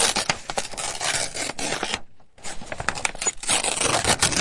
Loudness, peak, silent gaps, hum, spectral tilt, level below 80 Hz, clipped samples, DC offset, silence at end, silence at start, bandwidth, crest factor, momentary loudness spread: -23 LUFS; -2 dBFS; none; none; -1 dB/octave; -44 dBFS; under 0.1%; under 0.1%; 0 s; 0 s; 11.5 kHz; 24 dB; 12 LU